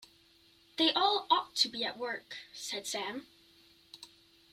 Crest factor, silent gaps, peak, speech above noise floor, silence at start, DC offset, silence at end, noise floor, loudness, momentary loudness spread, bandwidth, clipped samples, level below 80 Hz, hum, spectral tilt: 22 dB; none; -14 dBFS; 31 dB; 0 s; under 0.1%; 0.45 s; -64 dBFS; -32 LUFS; 19 LU; 16 kHz; under 0.1%; -78 dBFS; none; -1 dB/octave